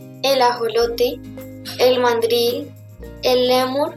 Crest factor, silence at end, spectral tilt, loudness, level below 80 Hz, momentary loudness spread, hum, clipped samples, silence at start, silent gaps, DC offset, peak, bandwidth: 14 dB; 0 s; -3.5 dB/octave; -18 LUFS; -46 dBFS; 17 LU; none; under 0.1%; 0 s; none; under 0.1%; -4 dBFS; 15 kHz